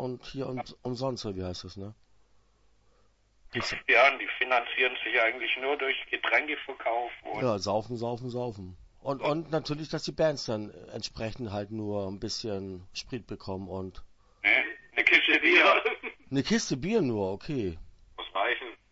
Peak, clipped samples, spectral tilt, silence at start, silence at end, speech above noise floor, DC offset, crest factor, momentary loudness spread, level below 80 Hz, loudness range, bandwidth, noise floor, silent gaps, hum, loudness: -6 dBFS; under 0.1%; -4.5 dB/octave; 0 s; 0.15 s; 35 dB; under 0.1%; 24 dB; 18 LU; -56 dBFS; 12 LU; 8 kHz; -65 dBFS; none; none; -28 LUFS